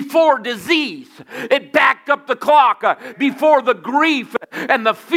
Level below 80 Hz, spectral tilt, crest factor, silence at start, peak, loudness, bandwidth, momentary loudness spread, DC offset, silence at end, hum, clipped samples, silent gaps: -70 dBFS; -3.5 dB/octave; 16 dB; 0 s; 0 dBFS; -16 LUFS; 16 kHz; 12 LU; under 0.1%; 0 s; none; under 0.1%; none